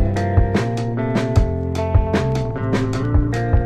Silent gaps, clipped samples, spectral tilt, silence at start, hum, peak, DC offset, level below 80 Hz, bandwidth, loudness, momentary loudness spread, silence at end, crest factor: none; under 0.1%; -7.5 dB/octave; 0 s; none; -2 dBFS; under 0.1%; -24 dBFS; 10 kHz; -20 LUFS; 4 LU; 0 s; 16 dB